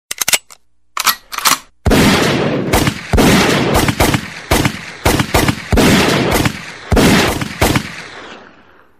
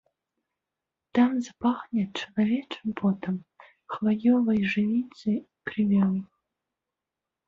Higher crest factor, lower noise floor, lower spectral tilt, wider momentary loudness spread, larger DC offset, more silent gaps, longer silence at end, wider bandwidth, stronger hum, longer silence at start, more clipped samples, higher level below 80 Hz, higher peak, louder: about the same, 14 dB vs 16 dB; second, -46 dBFS vs -88 dBFS; second, -4 dB/octave vs -7.5 dB/octave; about the same, 9 LU vs 10 LU; first, 0.2% vs under 0.1%; neither; second, 0.6 s vs 1.2 s; first, 16 kHz vs 7.4 kHz; neither; second, 0.1 s vs 1.15 s; neither; first, -26 dBFS vs -66 dBFS; first, 0 dBFS vs -10 dBFS; first, -13 LUFS vs -27 LUFS